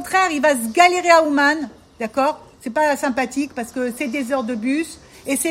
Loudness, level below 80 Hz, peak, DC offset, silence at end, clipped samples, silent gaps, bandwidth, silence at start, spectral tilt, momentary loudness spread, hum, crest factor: -19 LUFS; -58 dBFS; 0 dBFS; under 0.1%; 0 s; under 0.1%; none; 16.5 kHz; 0 s; -2.5 dB/octave; 12 LU; none; 20 dB